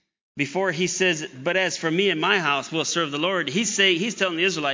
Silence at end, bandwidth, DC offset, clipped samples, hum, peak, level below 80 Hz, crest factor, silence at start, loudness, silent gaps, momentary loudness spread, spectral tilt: 0 s; 7.6 kHz; under 0.1%; under 0.1%; none; -6 dBFS; -72 dBFS; 18 dB; 0.35 s; -22 LUFS; none; 6 LU; -3 dB/octave